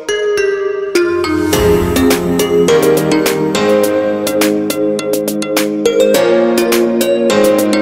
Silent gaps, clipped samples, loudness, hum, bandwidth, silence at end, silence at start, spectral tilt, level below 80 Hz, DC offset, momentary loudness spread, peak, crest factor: none; under 0.1%; -12 LUFS; none; 16.5 kHz; 0 s; 0 s; -4.5 dB/octave; -36 dBFS; under 0.1%; 5 LU; 0 dBFS; 12 dB